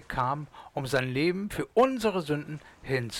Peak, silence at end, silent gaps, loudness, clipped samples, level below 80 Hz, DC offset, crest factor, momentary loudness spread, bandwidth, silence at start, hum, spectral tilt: -14 dBFS; 0 s; none; -29 LUFS; under 0.1%; -54 dBFS; under 0.1%; 16 dB; 12 LU; 17 kHz; 0 s; none; -5.5 dB/octave